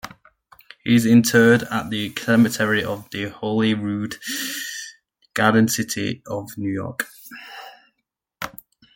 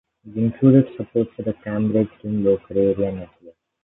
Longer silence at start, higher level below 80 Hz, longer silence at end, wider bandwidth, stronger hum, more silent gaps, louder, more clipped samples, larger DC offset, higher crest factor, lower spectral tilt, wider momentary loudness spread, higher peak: second, 0.05 s vs 0.25 s; second, -60 dBFS vs -50 dBFS; about the same, 0.45 s vs 0.35 s; first, 17 kHz vs 3.9 kHz; neither; neither; about the same, -20 LUFS vs -20 LUFS; neither; neither; about the same, 20 dB vs 18 dB; second, -4.5 dB/octave vs -13.5 dB/octave; first, 19 LU vs 11 LU; about the same, -2 dBFS vs -2 dBFS